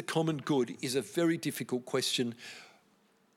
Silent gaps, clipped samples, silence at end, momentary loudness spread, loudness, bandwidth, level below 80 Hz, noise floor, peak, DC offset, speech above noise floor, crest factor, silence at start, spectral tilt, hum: none; under 0.1%; 0.7 s; 11 LU; -32 LUFS; 17 kHz; -84 dBFS; -68 dBFS; -16 dBFS; under 0.1%; 36 dB; 18 dB; 0 s; -4.5 dB/octave; none